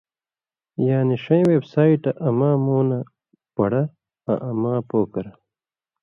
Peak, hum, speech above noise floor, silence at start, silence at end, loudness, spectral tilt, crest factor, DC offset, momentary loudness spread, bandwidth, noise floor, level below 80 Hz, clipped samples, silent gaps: -4 dBFS; none; over 71 dB; 0.8 s; 0.75 s; -21 LUFS; -10.5 dB/octave; 18 dB; under 0.1%; 14 LU; 5.8 kHz; under -90 dBFS; -60 dBFS; under 0.1%; none